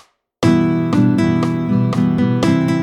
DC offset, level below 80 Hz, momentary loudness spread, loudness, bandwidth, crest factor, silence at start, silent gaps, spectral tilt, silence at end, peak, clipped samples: under 0.1%; -48 dBFS; 3 LU; -15 LUFS; 12 kHz; 14 dB; 0.4 s; none; -7.5 dB/octave; 0 s; -2 dBFS; under 0.1%